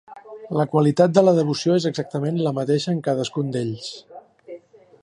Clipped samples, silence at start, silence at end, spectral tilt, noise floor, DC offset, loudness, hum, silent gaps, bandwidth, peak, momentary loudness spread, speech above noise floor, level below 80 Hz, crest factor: under 0.1%; 0.1 s; 0.45 s; -6.5 dB/octave; -43 dBFS; under 0.1%; -21 LUFS; none; none; 11 kHz; -2 dBFS; 24 LU; 23 dB; -68 dBFS; 20 dB